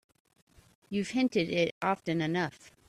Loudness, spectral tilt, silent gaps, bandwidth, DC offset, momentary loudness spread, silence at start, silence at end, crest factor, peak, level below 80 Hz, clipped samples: -31 LUFS; -5.5 dB/octave; 1.71-1.81 s; 13 kHz; under 0.1%; 7 LU; 0.9 s; 0.2 s; 18 dB; -14 dBFS; -68 dBFS; under 0.1%